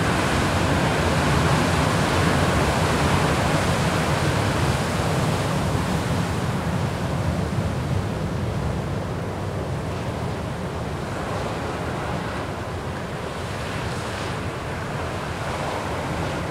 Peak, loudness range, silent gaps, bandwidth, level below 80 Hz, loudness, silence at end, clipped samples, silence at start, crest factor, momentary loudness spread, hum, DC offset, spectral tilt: -6 dBFS; 8 LU; none; 16 kHz; -36 dBFS; -24 LUFS; 0 s; under 0.1%; 0 s; 16 dB; 9 LU; none; under 0.1%; -5.5 dB/octave